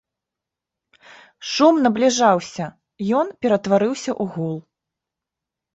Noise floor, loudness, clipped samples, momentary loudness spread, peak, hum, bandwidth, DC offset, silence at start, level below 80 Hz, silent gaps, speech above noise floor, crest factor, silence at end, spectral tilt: -86 dBFS; -19 LUFS; under 0.1%; 15 LU; -2 dBFS; none; 8.2 kHz; under 0.1%; 1.4 s; -64 dBFS; none; 67 dB; 18 dB; 1.15 s; -5 dB/octave